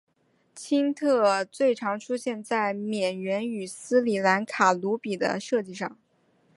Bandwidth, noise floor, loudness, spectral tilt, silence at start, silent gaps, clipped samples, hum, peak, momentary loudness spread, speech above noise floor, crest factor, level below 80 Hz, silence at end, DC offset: 11.5 kHz; -66 dBFS; -26 LUFS; -4.5 dB/octave; 0.55 s; none; under 0.1%; none; -6 dBFS; 9 LU; 40 dB; 20 dB; -76 dBFS; 0.65 s; under 0.1%